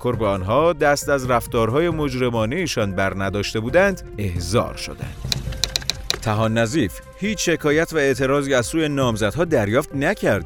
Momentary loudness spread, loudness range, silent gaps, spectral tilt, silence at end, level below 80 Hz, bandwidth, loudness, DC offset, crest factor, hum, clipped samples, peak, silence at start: 7 LU; 3 LU; none; -5 dB/octave; 0 s; -38 dBFS; over 20 kHz; -20 LUFS; under 0.1%; 20 dB; none; under 0.1%; 0 dBFS; 0 s